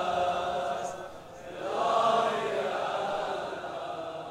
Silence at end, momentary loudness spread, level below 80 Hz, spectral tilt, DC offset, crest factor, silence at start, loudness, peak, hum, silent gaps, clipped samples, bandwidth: 0 s; 13 LU; -64 dBFS; -4 dB/octave; under 0.1%; 16 dB; 0 s; -30 LUFS; -14 dBFS; none; none; under 0.1%; 15 kHz